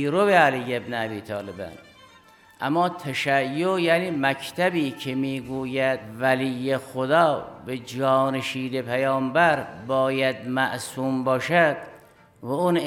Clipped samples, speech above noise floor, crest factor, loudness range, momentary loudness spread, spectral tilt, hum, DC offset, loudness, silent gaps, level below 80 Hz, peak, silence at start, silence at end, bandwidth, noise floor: under 0.1%; 29 dB; 20 dB; 2 LU; 12 LU; -5.5 dB/octave; none; under 0.1%; -24 LUFS; none; -66 dBFS; -4 dBFS; 0 s; 0 s; 17 kHz; -53 dBFS